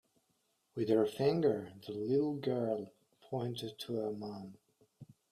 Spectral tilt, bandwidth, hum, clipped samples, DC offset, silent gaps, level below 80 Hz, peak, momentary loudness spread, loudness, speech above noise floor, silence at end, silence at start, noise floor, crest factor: -7.5 dB/octave; 15 kHz; none; under 0.1%; under 0.1%; none; -76 dBFS; -18 dBFS; 15 LU; -36 LUFS; 44 dB; 0.25 s; 0.75 s; -79 dBFS; 18 dB